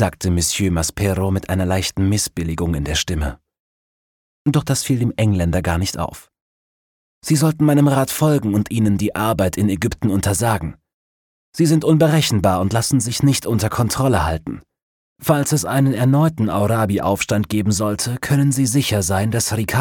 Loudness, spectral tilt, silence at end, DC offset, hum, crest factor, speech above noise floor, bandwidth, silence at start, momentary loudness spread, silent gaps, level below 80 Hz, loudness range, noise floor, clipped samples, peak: -18 LUFS; -5.5 dB/octave; 0 s; under 0.1%; none; 16 dB; over 73 dB; 18.5 kHz; 0 s; 7 LU; 3.59-4.45 s, 6.41-7.22 s, 10.93-11.53 s, 14.83-15.16 s; -36 dBFS; 4 LU; under -90 dBFS; under 0.1%; -4 dBFS